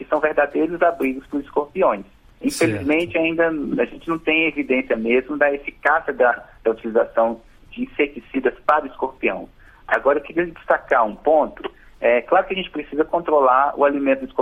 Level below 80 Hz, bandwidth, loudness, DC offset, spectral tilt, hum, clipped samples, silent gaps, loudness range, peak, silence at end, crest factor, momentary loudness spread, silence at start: -50 dBFS; 16 kHz; -20 LUFS; under 0.1%; -5 dB/octave; none; under 0.1%; none; 3 LU; -2 dBFS; 0 s; 18 dB; 8 LU; 0 s